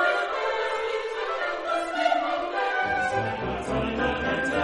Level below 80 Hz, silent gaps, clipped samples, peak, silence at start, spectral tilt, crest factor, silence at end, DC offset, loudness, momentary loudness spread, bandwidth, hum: -48 dBFS; none; under 0.1%; -10 dBFS; 0 s; -5 dB/octave; 16 dB; 0 s; under 0.1%; -26 LUFS; 5 LU; 11.5 kHz; none